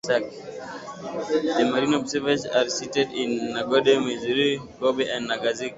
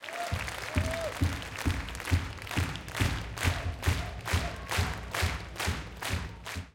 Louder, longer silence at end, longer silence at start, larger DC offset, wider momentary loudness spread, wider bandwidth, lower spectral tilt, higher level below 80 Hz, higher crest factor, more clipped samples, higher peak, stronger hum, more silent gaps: first, -24 LUFS vs -33 LUFS; about the same, 0 s vs 0.05 s; about the same, 0.05 s vs 0 s; neither; first, 14 LU vs 3 LU; second, 8 kHz vs 17 kHz; about the same, -4 dB/octave vs -4.5 dB/octave; second, -62 dBFS vs -42 dBFS; about the same, 20 dB vs 18 dB; neither; first, -4 dBFS vs -14 dBFS; neither; neither